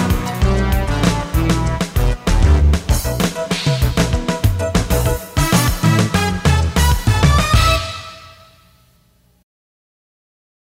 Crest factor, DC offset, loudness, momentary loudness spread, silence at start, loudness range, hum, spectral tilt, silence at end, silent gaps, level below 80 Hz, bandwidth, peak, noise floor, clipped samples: 14 dB; under 0.1%; -16 LUFS; 6 LU; 0 s; 4 LU; none; -5 dB/octave; 2.4 s; none; -20 dBFS; 16.5 kHz; -2 dBFS; -55 dBFS; under 0.1%